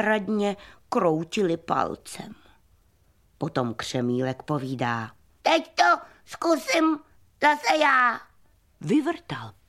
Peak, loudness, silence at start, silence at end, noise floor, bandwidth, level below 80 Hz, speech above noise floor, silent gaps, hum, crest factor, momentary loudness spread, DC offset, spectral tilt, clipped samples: -6 dBFS; -25 LUFS; 0 s; 0.15 s; -63 dBFS; 14.5 kHz; -64 dBFS; 38 dB; none; none; 20 dB; 16 LU; under 0.1%; -5 dB/octave; under 0.1%